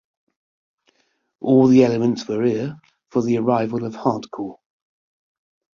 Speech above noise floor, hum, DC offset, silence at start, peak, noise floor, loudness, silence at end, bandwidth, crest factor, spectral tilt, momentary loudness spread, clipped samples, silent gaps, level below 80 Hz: 49 dB; none; under 0.1%; 1.4 s; -2 dBFS; -68 dBFS; -19 LUFS; 1.25 s; 7.2 kHz; 20 dB; -7.5 dB/octave; 17 LU; under 0.1%; none; -62 dBFS